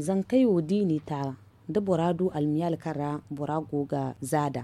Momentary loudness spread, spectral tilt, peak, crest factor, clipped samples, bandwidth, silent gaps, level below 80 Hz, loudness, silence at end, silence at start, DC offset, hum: 10 LU; -7.5 dB/octave; -12 dBFS; 16 dB; under 0.1%; 14 kHz; none; -62 dBFS; -28 LUFS; 0 s; 0 s; under 0.1%; none